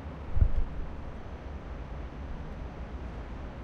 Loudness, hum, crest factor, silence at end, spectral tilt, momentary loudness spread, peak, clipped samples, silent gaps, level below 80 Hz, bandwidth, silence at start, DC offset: -38 LUFS; none; 20 dB; 0 s; -8.5 dB/octave; 12 LU; -12 dBFS; under 0.1%; none; -34 dBFS; 6.2 kHz; 0 s; under 0.1%